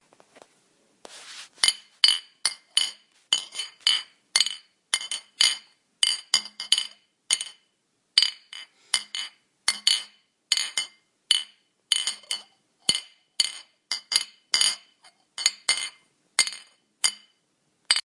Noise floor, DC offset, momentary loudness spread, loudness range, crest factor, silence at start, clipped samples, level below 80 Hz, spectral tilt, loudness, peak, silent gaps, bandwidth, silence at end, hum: -72 dBFS; under 0.1%; 16 LU; 3 LU; 28 dB; 1.1 s; under 0.1%; -80 dBFS; 3.5 dB/octave; -24 LUFS; 0 dBFS; none; 11.5 kHz; 0.05 s; none